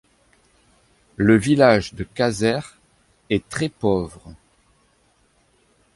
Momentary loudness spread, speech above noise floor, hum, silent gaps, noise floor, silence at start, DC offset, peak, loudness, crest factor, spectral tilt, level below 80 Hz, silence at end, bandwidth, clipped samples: 14 LU; 42 dB; none; none; -61 dBFS; 1.2 s; under 0.1%; -2 dBFS; -20 LUFS; 20 dB; -6 dB/octave; -48 dBFS; 1.65 s; 11.5 kHz; under 0.1%